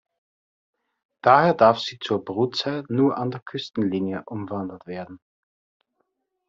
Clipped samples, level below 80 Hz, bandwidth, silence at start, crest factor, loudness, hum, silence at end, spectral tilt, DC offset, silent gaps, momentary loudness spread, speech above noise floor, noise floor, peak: under 0.1%; -66 dBFS; 7.6 kHz; 1.25 s; 22 dB; -22 LUFS; none; 1.3 s; -4.5 dB/octave; under 0.1%; 3.42-3.46 s; 16 LU; 53 dB; -75 dBFS; -2 dBFS